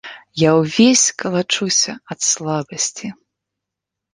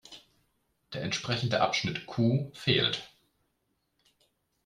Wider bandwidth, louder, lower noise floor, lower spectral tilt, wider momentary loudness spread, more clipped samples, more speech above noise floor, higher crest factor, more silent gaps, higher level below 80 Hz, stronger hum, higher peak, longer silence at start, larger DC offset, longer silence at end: about the same, 11 kHz vs 12 kHz; first, -16 LUFS vs -29 LUFS; first, -83 dBFS vs -78 dBFS; second, -3 dB/octave vs -5 dB/octave; about the same, 11 LU vs 11 LU; neither; first, 66 dB vs 48 dB; about the same, 18 dB vs 22 dB; neither; about the same, -60 dBFS vs -64 dBFS; neither; first, 0 dBFS vs -12 dBFS; about the same, 0.05 s vs 0.1 s; neither; second, 1 s vs 1.6 s